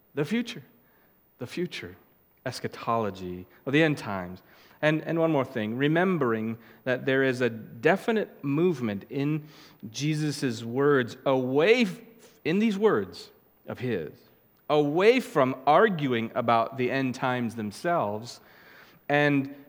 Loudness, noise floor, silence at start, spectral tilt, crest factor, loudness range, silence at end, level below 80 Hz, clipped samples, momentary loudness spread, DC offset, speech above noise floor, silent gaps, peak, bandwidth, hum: -26 LUFS; -62 dBFS; 0.15 s; -6 dB/octave; 20 dB; 6 LU; 0.05 s; -72 dBFS; under 0.1%; 17 LU; under 0.1%; 36 dB; none; -6 dBFS; 17.5 kHz; none